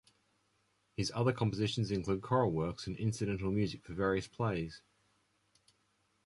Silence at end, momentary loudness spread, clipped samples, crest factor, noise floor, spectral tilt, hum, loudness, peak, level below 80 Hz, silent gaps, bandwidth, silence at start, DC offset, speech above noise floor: 1.45 s; 7 LU; under 0.1%; 20 dB; -76 dBFS; -6.5 dB/octave; none; -35 LUFS; -16 dBFS; -58 dBFS; none; 11.5 kHz; 1 s; under 0.1%; 42 dB